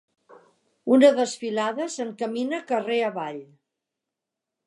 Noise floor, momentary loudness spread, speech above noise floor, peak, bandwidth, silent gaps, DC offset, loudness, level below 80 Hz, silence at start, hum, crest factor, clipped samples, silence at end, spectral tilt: -86 dBFS; 16 LU; 63 dB; -6 dBFS; 11 kHz; none; under 0.1%; -23 LUFS; -84 dBFS; 0.85 s; none; 20 dB; under 0.1%; 1.2 s; -4 dB/octave